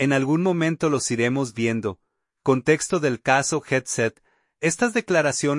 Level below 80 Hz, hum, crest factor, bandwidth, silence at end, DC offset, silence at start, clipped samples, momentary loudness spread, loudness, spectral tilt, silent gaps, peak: -62 dBFS; none; 18 dB; 11.5 kHz; 0 s; under 0.1%; 0 s; under 0.1%; 5 LU; -22 LUFS; -4.5 dB/octave; none; -4 dBFS